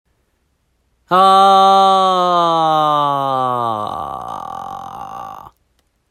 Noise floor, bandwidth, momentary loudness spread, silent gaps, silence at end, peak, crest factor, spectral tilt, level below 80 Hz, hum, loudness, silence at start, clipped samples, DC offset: -64 dBFS; 13 kHz; 20 LU; none; 0.6 s; 0 dBFS; 14 dB; -5 dB/octave; -58 dBFS; none; -13 LUFS; 1.1 s; under 0.1%; under 0.1%